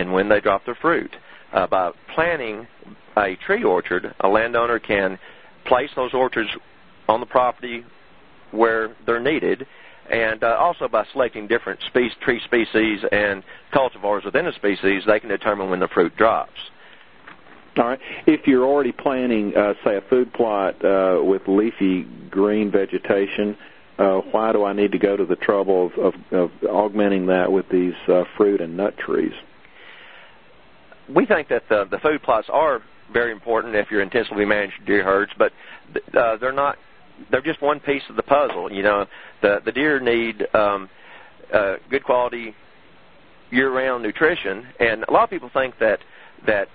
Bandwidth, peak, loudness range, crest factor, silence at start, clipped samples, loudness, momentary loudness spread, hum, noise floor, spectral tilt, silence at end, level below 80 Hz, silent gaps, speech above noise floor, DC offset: 4.9 kHz; 0 dBFS; 3 LU; 20 dB; 0 s; under 0.1%; -20 LUFS; 7 LU; none; -51 dBFS; -10 dB/octave; 0.1 s; -54 dBFS; none; 31 dB; 0.4%